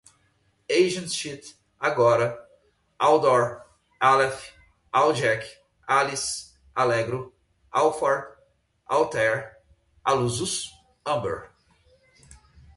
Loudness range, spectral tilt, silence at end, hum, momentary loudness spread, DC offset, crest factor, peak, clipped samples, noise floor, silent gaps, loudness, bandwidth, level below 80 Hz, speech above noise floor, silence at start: 4 LU; -4 dB/octave; 0.4 s; none; 18 LU; under 0.1%; 20 dB; -6 dBFS; under 0.1%; -67 dBFS; none; -24 LUFS; 11.5 kHz; -60 dBFS; 44 dB; 0.7 s